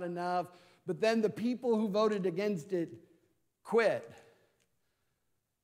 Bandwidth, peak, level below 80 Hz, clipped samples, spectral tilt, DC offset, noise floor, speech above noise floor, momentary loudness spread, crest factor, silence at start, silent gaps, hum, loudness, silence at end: 15 kHz; -16 dBFS; -84 dBFS; under 0.1%; -6 dB/octave; under 0.1%; -81 dBFS; 48 dB; 11 LU; 18 dB; 0 s; none; none; -33 LUFS; 1.45 s